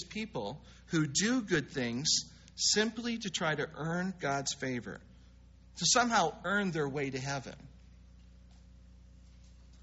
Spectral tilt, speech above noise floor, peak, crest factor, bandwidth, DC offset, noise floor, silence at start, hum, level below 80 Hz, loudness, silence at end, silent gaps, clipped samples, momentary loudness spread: -3 dB/octave; 24 dB; -14 dBFS; 20 dB; 8 kHz; under 0.1%; -57 dBFS; 0 s; 60 Hz at -60 dBFS; -58 dBFS; -32 LUFS; 0.05 s; none; under 0.1%; 15 LU